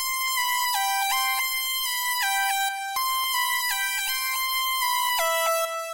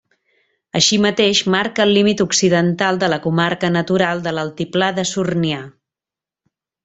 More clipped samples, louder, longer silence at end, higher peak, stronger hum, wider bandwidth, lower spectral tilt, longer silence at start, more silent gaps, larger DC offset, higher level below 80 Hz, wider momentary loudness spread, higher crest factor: neither; second, -23 LUFS vs -16 LUFS; second, 0 s vs 1.15 s; second, -14 dBFS vs -2 dBFS; neither; first, 16 kHz vs 8.4 kHz; second, 4.5 dB/octave vs -4 dB/octave; second, 0 s vs 0.75 s; neither; neither; second, -64 dBFS vs -56 dBFS; second, 2 LU vs 8 LU; about the same, 12 dB vs 16 dB